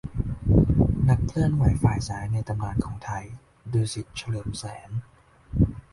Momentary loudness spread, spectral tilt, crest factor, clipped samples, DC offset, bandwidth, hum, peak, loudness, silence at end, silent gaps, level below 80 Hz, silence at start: 14 LU; -7.5 dB/octave; 20 dB; under 0.1%; under 0.1%; 11.5 kHz; none; -6 dBFS; -26 LUFS; 0.1 s; none; -34 dBFS; 0.05 s